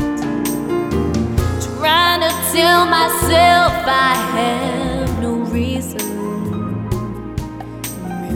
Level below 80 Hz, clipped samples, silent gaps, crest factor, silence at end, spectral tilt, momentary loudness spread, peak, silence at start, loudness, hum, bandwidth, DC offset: -32 dBFS; under 0.1%; none; 16 dB; 0 s; -4 dB/octave; 14 LU; -2 dBFS; 0 s; -16 LUFS; none; 18 kHz; under 0.1%